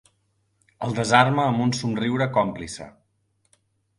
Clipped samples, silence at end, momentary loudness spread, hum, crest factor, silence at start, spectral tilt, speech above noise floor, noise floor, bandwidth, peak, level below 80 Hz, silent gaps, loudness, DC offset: under 0.1%; 1.1 s; 17 LU; none; 24 dB; 0.8 s; -5.5 dB/octave; 48 dB; -69 dBFS; 11.5 kHz; -2 dBFS; -56 dBFS; none; -22 LUFS; under 0.1%